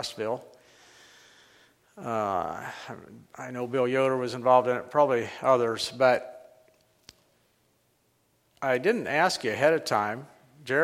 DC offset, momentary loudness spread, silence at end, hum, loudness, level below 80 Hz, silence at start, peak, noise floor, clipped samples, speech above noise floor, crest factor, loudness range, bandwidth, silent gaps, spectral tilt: under 0.1%; 18 LU; 0 s; none; -26 LUFS; -72 dBFS; 0 s; -8 dBFS; -69 dBFS; under 0.1%; 43 dB; 20 dB; 10 LU; 15.5 kHz; none; -4.5 dB/octave